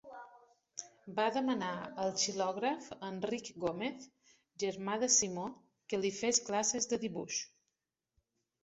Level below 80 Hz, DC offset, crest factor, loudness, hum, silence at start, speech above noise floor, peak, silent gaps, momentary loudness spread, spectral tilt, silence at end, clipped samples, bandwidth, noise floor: -76 dBFS; under 0.1%; 22 dB; -35 LUFS; none; 0.05 s; 52 dB; -14 dBFS; none; 17 LU; -3 dB/octave; 1.15 s; under 0.1%; 8 kHz; -87 dBFS